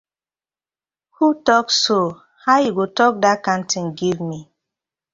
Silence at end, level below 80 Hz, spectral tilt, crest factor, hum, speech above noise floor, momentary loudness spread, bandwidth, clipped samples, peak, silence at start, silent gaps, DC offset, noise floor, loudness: 0.7 s; -62 dBFS; -3.5 dB/octave; 18 dB; none; over 72 dB; 10 LU; 7.8 kHz; under 0.1%; -2 dBFS; 1.2 s; none; under 0.1%; under -90 dBFS; -18 LUFS